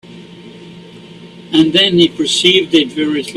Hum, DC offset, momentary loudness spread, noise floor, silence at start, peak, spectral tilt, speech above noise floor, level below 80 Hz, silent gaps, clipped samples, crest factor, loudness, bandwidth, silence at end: none; under 0.1%; 7 LU; -35 dBFS; 0.1 s; 0 dBFS; -4 dB/octave; 23 dB; -54 dBFS; none; under 0.1%; 14 dB; -11 LUFS; 13 kHz; 0 s